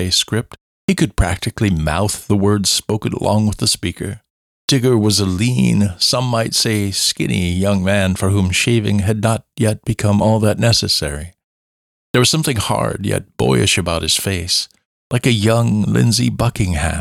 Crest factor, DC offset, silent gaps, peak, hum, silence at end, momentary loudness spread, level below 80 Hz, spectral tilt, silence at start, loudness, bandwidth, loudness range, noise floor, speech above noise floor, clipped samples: 14 dB; under 0.1%; 0.61-0.88 s, 4.30-4.68 s, 11.44-12.14 s, 14.85-15.10 s; -2 dBFS; none; 0 s; 7 LU; -34 dBFS; -4.5 dB/octave; 0 s; -16 LUFS; 16 kHz; 2 LU; under -90 dBFS; over 74 dB; under 0.1%